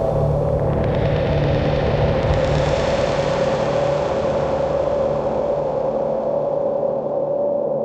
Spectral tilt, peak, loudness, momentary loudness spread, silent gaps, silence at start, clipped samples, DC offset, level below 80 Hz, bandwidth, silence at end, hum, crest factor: -7.5 dB/octave; -6 dBFS; -20 LUFS; 2 LU; none; 0 s; under 0.1%; under 0.1%; -32 dBFS; 8.6 kHz; 0 s; none; 14 dB